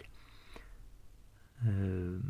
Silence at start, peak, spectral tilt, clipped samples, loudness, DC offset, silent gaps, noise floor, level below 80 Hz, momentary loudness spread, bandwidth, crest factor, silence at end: 0 s; -24 dBFS; -9 dB/octave; under 0.1%; -35 LUFS; under 0.1%; none; -58 dBFS; -50 dBFS; 25 LU; 11 kHz; 16 dB; 0 s